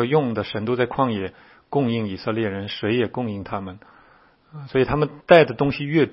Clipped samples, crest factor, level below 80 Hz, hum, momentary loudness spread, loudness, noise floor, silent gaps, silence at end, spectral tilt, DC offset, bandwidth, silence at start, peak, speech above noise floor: under 0.1%; 22 dB; -50 dBFS; none; 15 LU; -22 LUFS; -55 dBFS; none; 0 s; -9 dB/octave; under 0.1%; 5.8 kHz; 0 s; 0 dBFS; 33 dB